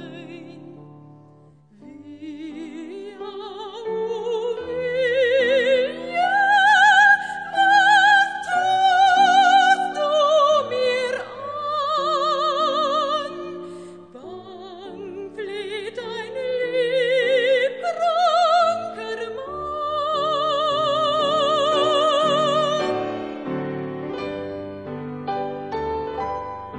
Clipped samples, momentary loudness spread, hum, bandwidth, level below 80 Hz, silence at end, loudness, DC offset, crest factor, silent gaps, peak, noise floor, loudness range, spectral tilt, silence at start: under 0.1%; 20 LU; none; 10 kHz; -58 dBFS; 0 s; -20 LUFS; under 0.1%; 16 dB; none; -4 dBFS; -51 dBFS; 15 LU; -3 dB/octave; 0 s